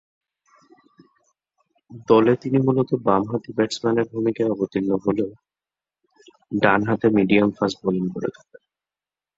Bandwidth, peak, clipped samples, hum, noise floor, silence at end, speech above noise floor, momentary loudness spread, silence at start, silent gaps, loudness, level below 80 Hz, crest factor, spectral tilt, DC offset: 7.8 kHz; -2 dBFS; under 0.1%; none; under -90 dBFS; 1.05 s; over 70 dB; 9 LU; 1.9 s; none; -21 LUFS; -58 dBFS; 22 dB; -7 dB/octave; under 0.1%